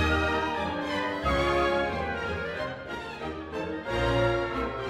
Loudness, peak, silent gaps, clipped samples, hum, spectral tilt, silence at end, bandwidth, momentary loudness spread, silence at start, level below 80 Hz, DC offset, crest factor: -29 LUFS; -14 dBFS; none; under 0.1%; none; -6 dB/octave; 0 s; 14.5 kHz; 10 LU; 0 s; -40 dBFS; under 0.1%; 14 dB